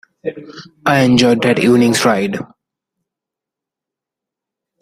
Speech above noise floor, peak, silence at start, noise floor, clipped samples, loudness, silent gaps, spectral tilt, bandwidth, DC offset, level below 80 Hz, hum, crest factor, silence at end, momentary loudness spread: 71 dB; 0 dBFS; 0.25 s; -85 dBFS; under 0.1%; -13 LUFS; none; -5 dB/octave; 15 kHz; under 0.1%; -54 dBFS; none; 16 dB; 2.35 s; 16 LU